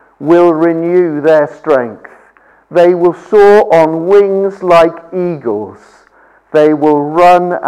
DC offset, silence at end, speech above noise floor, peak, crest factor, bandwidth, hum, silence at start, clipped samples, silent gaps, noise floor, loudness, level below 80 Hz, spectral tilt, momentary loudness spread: under 0.1%; 0 s; 37 dB; 0 dBFS; 10 dB; 10.5 kHz; none; 0.2 s; under 0.1%; none; -46 dBFS; -9 LUFS; -48 dBFS; -7 dB/octave; 10 LU